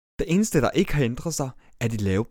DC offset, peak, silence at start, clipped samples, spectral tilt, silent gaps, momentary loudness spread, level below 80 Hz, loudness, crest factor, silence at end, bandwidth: under 0.1%; -6 dBFS; 0.2 s; under 0.1%; -5.5 dB/octave; none; 8 LU; -40 dBFS; -25 LUFS; 18 dB; 0.05 s; 18 kHz